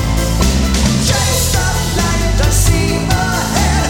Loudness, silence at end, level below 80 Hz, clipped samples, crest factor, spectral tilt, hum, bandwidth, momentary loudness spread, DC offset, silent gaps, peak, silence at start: -14 LUFS; 0 s; -18 dBFS; under 0.1%; 12 dB; -4 dB/octave; none; 18.5 kHz; 2 LU; under 0.1%; none; 0 dBFS; 0 s